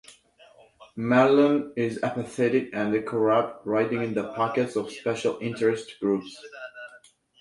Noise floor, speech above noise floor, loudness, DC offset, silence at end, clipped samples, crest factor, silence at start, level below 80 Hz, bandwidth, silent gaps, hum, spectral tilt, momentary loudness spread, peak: -55 dBFS; 31 dB; -25 LUFS; under 0.1%; 0.45 s; under 0.1%; 20 dB; 0.1 s; -66 dBFS; 11.5 kHz; none; none; -6.5 dB/octave; 20 LU; -6 dBFS